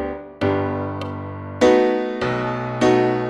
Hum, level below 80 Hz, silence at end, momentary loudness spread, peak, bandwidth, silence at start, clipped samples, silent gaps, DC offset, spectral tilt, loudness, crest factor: none; -48 dBFS; 0 s; 14 LU; -4 dBFS; 10.5 kHz; 0 s; under 0.1%; none; under 0.1%; -6.5 dB/octave; -20 LUFS; 16 dB